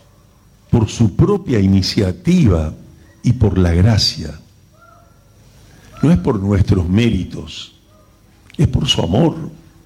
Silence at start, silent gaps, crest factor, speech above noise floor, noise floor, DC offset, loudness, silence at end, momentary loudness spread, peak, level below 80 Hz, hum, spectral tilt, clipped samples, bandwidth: 0.7 s; none; 12 dB; 34 dB; -48 dBFS; under 0.1%; -15 LUFS; 0.3 s; 15 LU; -4 dBFS; -30 dBFS; 50 Hz at -35 dBFS; -6.5 dB/octave; under 0.1%; 12.5 kHz